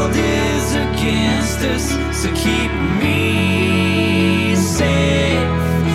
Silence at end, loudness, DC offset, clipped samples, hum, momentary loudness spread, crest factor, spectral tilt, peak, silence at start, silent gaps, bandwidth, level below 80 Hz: 0 s; -16 LUFS; under 0.1%; under 0.1%; none; 3 LU; 12 dB; -5 dB/octave; -4 dBFS; 0 s; none; 16 kHz; -28 dBFS